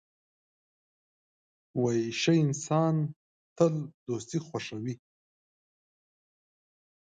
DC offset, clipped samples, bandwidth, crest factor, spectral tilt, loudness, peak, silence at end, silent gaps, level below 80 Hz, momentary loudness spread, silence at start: under 0.1%; under 0.1%; 9.2 kHz; 22 dB; -6 dB/octave; -30 LUFS; -10 dBFS; 2.05 s; 3.16-3.56 s, 3.94-4.06 s; -74 dBFS; 12 LU; 1.75 s